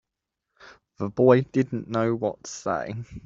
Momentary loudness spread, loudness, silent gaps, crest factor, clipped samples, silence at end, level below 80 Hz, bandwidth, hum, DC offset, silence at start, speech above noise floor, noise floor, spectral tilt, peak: 14 LU; -25 LUFS; none; 22 dB; under 0.1%; 0.05 s; -58 dBFS; 7.8 kHz; none; under 0.1%; 0.65 s; 60 dB; -84 dBFS; -7 dB/octave; -4 dBFS